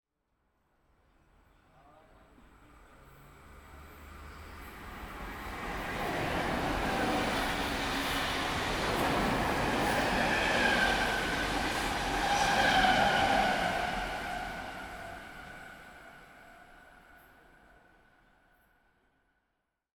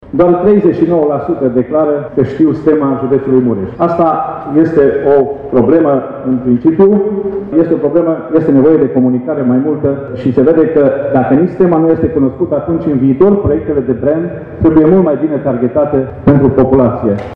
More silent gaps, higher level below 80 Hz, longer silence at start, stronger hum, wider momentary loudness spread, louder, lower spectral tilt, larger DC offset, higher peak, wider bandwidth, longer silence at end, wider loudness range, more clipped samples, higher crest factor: neither; second, -48 dBFS vs -38 dBFS; first, 3.1 s vs 0.05 s; neither; first, 22 LU vs 6 LU; second, -30 LUFS vs -11 LUFS; second, -3.5 dB/octave vs -11.5 dB/octave; neither; second, -14 dBFS vs 0 dBFS; first, over 20 kHz vs 4.5 kHz; first, 2.8 s vs 0 s; first, 20 LU vs 1 LU; neither; first, 20 dB vs 10 dB